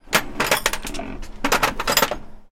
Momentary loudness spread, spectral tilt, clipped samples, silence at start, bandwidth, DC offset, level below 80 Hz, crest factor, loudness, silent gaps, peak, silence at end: 14 LU; -1.5 dB/octave; under 0.1%; 0.05 s; 17 kHz; under 0.1%; -36 dBFS; 22 dB; -21 LUFS; none; 0 dBFS; 0.1 s